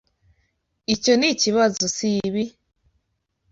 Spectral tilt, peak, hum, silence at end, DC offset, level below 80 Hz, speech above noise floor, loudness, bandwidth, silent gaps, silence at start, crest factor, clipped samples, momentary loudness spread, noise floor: -3 dB/octave; -6 dBFS; none; 1 s; under 0.1%; -58 dBFS; 53 dB; -20 LUFS; 8 kHz; none; 0.9 s; 18 dB; under 0.1%; 11 LU; -74 dBFS